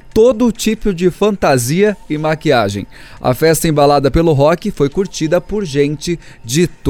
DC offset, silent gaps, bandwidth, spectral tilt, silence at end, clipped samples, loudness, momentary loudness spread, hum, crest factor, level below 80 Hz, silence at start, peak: under 0.1%; none; 17.5 kHz; -5.5 dB/octave; 0 s; under 0.1%; -14 LUFS; 8 LU; none; 12 dB; -32 dBFS; 0.05 s; 0 dBFS